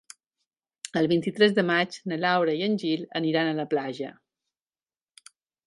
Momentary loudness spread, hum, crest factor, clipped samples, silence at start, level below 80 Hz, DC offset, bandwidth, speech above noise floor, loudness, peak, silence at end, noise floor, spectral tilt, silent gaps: 11 LU; none; 22 dB; under 0.1%; 0.85 s; -74 dBFS; under 0.1%; 11.5 kHz; over 65 dB; -25 LUFS; -6 dBFS; 1.55 s; under -90 dBFS; -5.5 dB/octave; none